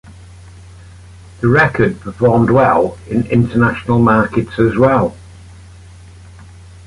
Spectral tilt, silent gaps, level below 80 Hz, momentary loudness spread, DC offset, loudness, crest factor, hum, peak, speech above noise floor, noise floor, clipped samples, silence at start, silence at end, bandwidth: -8.5 dB/octave; none; -38 dBFS; 7 LU; under 0.1%; -13 LUFS; 14 dB; none; -2 dBFS; 25 dB; -37 dBFS; under 0.1%; 0.1 s; 0.4 s; 11.5 kHz